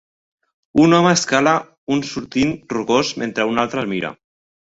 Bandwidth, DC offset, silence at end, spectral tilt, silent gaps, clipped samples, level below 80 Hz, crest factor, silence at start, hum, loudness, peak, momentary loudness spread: 8 kHz; under 0.1%; 0.55 s; -4.5 dB/octave; 1.78-1.87 s; under 0.1%; -52 dBFS; 18 dB; 0.75 s; none; -18 LUFS; -2 dBFS; 10 LU